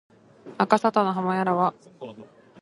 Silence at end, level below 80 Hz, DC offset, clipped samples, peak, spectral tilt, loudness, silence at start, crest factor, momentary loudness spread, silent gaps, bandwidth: 0.4 s; -72 dBFS; under 0.1%; under 0.1%; -4 dBFS; -6.5 dB/octave; -23 LUFS; 0.45 s; 22 dB; 21 LU; none; 11.5 kHz